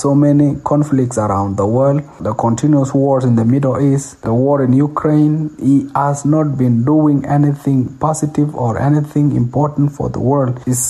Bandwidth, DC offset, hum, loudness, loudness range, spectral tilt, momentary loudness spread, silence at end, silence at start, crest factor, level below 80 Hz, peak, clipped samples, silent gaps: 13 kHz; under 0.1%; none; -14 LUFS; 2 LU; -8 dB/octave; 5 LU; 0 s; 0 s; 10 dB; -44 dBFS; -2 dBFS; under 0.1%; none